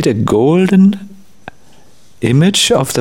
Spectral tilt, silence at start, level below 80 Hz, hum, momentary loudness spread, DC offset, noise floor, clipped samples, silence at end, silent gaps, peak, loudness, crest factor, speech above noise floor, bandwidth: -5 dB/octave; 0 s; -46 dBFS; none; 7 LU; 0.9%; -47 dBFS; under 0.1%; 0 s; none; 0 dBFS; -11 LUFS; 12 dB; 37 dB; 17 kHz